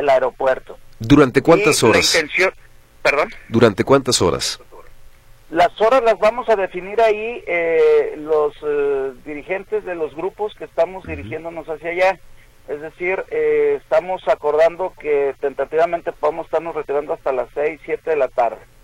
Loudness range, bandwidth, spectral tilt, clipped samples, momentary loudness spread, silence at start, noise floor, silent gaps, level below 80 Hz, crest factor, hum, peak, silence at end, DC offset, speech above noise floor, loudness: 8 LU; 15.5 kHz; -4 dB/octave; under 0.1%; 12 LU; 0 s; -42 dBFS; none; -44 dBFS; 18 dB; none; 0 dBFS; 0.25 s; under 0.1%; 24 dB; -18 LUFS